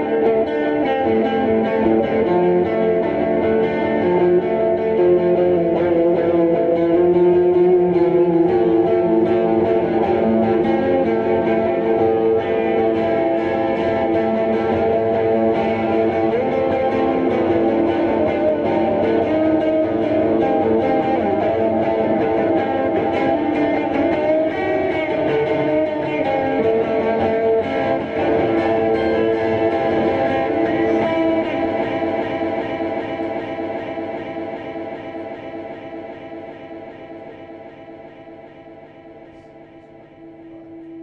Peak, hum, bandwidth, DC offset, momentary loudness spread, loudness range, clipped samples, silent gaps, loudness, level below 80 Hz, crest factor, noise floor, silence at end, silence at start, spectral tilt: -4 dBFS; none; 5.6 kHz; under 0.1%; 12 LU; 12 LU; under 0.1%; none; -18 LUFS; -48 dBFS; 12 dB; -43 dBFS; 0 s; 0 s; -8.5 dB/octave